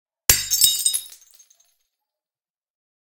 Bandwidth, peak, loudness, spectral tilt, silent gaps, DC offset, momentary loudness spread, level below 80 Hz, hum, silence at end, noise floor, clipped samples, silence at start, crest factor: 19 kHz; 0 dBFS; -17 LUFS; 1 dB/octave; none; under 0.1%; 7 LU; -44 dBFS; none; 2 s; under -90 dBFS; under 0.1%; 0.3 s; 24 dB